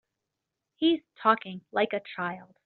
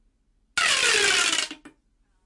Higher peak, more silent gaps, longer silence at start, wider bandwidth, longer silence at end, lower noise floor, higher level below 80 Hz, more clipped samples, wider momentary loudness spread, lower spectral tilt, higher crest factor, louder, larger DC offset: first, -6 dBFS vs -10 dBFS; neither; first, 0.8 s vs 0.55 s; second, 4.5 kHz vs 11.5 kHz; second, 0.2 s vs 0.55 s; first, -86 dBFS vs -66 dBFS; second, -76 dBFS vs -60 dBFS; neither; about the same, 9 LU vs 11 LU; first, -2.5 dB/octave vs 1.5 dB/octave; first, 24 dB vs 14 dB; second, -28 LUFS vs -20 LUFS; neither